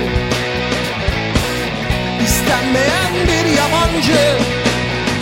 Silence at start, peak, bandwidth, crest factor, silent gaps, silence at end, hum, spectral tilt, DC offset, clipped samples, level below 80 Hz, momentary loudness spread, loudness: 0 s; 0 dBFS; 16.5 kHz; 16 dB; none; 0 s; none; -4 dB/octave; under 0.1%; under 0.1%; -28 dBFS; 5 LU; -15 LUFS